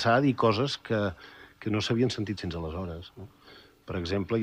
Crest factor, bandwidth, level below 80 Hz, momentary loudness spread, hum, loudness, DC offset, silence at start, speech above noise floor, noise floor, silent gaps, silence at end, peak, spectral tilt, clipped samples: 18 dB; 15 kHz; -52 dBFS; 23 LU; none; -29 LUFS; under 0.1%; 0 s; 26 dB; -54 dBFS; none; 0 s; -12 dBFS; -6 dB/octave; under 0.1%